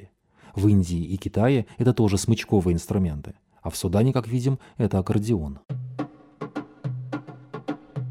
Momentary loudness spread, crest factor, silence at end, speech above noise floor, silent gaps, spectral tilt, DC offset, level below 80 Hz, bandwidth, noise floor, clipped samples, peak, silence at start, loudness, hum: 15 LU; 16 dB; 0 s; 31 dB; none; -7 dB/octave; under 0.1%; -44 dBFS; 15.5 kHz; -53 dBFS; under 0.1%; -8 dBFS; 0 s; -25 LUFS; none